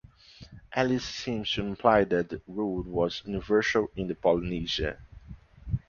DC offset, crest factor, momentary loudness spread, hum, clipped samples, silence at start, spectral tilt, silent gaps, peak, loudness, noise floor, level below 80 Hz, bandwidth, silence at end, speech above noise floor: under 0.1%; 22 dB; 11 LU; none; under 0.1%; 0.4 s; -5.5 dB/octave; none; -6 dBFS; -28 LUFS; -51 dBFS; -46 dBFS; 7.2 kHz; 0.1 s; 24 dB